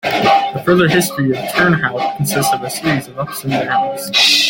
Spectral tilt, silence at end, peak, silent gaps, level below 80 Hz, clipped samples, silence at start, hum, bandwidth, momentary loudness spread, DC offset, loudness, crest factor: -4 dB/octave; 0 s; 0 dBFS; none; -50 dBFS; under 0.1%; 0.05 s; none; 17 kHz; 7 LU; under 0.1%; -15 LUFS; 14 dB